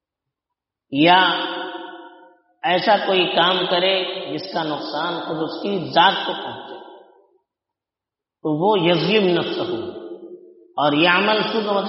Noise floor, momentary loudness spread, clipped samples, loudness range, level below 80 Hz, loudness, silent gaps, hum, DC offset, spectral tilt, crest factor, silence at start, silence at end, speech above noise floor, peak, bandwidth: -87 dBFS; 17 LU; under 0.1%; 4 LU; -68 dBFS; -19 LUFS; none; none; under 0.1%; -2 dB/octave; 20 dB; 0.9 s; 0 s; 69 dB; -2 dBFS; 6 kHz